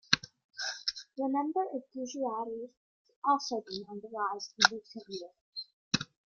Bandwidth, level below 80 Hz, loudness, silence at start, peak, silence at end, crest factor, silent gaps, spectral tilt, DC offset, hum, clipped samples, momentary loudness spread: 7.4 kHz; -74 dBFS; -33 LUFS; 0.1 s; -4 dBFS; 0.3 s; 32 dB; 0.44-0.49 s, 2.77-3.05 s, 3.16-3.22 s, 5.41-5.52 s, 5.73-5.91 s; -2.5 dB/octave; under 0.1%; none; under 0.1%; 17 LU